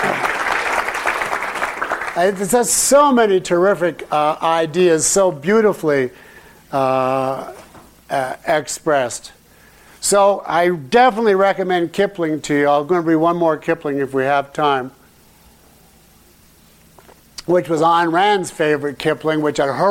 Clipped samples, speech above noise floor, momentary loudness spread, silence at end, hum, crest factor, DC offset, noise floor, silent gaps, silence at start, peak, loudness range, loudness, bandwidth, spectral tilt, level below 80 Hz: under 0.1%; 33 dB; 8 LU; 0 s; none; 14 dB; under 0.1%; -49 dBFS; none; 0 s; -4 dBFS; 7 LU; -17 LUFS; 16.5 kHz; -4 dB/octave; -52 dBFS